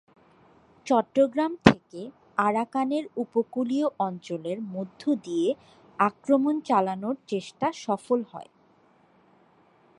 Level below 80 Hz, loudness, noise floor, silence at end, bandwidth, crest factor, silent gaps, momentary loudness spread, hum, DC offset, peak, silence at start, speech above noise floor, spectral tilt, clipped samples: -62 dBFS; -26 LUFS; -61 dBFS; 1.55 s; 11 kHz; 26 dB; none; 12 LU; none; under 0.1%; 0 dBFS; 0.85 s; 35 dB; -6.5 dB/octave; under 0.1%